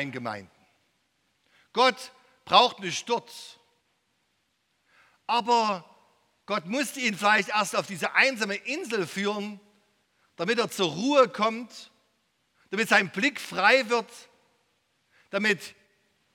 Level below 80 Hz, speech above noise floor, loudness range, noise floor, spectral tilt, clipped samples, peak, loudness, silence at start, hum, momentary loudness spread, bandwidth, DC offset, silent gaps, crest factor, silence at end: -80 dBFS; 48 dB; 5 LU; -74 dBFS; -3 dB/octave; under 0.1%; -4 dBFS; -25 LUFS; 0 s; none; 19 LU; 17.5 kHz; under 0.1%; none; 26 dB; 0.65 s